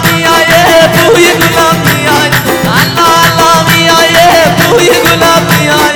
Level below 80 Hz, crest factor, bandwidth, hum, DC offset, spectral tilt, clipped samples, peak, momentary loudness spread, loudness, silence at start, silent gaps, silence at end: -32 dBFS; 6 dB; over 20 kHz; none; 0.4%; -3.5 dB/octave; 4%; 0 dBFS; 4 LU; -5 LUFS; 0 s; none; 0 s